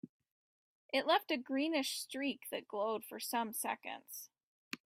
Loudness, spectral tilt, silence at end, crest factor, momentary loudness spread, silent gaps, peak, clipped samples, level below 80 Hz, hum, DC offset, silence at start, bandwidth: -38 LUFS; -2 dB/octave; 0.1 s; 20 dB; 16 LU; 0.09-0.20 s, 0.32-0.89 s, 4.43-4.71 s; -20 dBFS; under 0.1%; -88 dBFS; none; under 0.1%; 0.05 s; 16 kHz